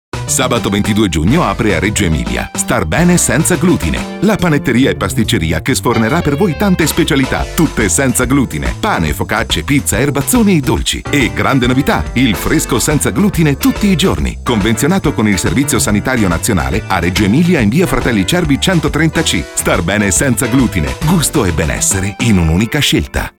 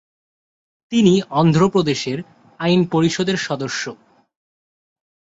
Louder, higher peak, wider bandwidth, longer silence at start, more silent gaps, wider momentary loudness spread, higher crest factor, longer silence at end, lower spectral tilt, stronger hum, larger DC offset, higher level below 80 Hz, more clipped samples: first, -12 LUFS vs -18 LUFS; about the same, -2 dBFS vs -2 dBFS; first, 18.5 kHz vs 8 kHz; second, 0.15 s vs 0.9 s; neither; second, 4 LU vs 11 LU; second, 10 dB vs 18 dB; second, 0.1 s vs 1.45 s; second, -4.5 dB/octave vs -6 dB/octave; neither; neither; first, -26 dBFS vs -56 dBFS; neither